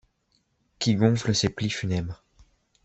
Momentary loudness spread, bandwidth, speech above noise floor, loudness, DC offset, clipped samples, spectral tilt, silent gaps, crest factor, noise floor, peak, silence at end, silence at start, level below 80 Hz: 12 LU; 8.2 kHz; 46 dB; -25 LUFS; under 0.1%; under 0.1%; -5 dB/octave; none; 22 dB; -71 dBFS; -6 dBFS; 0.7 s; 0.8 s; -54 dBFS